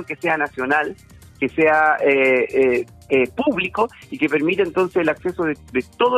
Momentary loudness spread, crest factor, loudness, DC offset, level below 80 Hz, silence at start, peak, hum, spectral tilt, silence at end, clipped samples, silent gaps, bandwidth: 9 LU; 14 dB; -19 LUFS; under 0.1%; -54 dBFS; 0 s; -4 dBFS; none; -6 dB/octave; 0 s; under 0.1%; none; 13.5 kHz